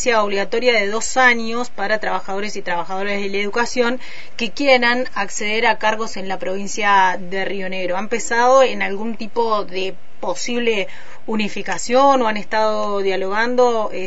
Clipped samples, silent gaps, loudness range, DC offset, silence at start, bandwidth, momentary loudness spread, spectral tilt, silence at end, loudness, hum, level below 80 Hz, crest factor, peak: under 0.1%; none; 2 LU; 7%; 0 s; 8 kHz; 11 LU; -3 dB/octave; 0 s; -19 LUFS; none; -54 dBFS; 18 dB; 0 dBFS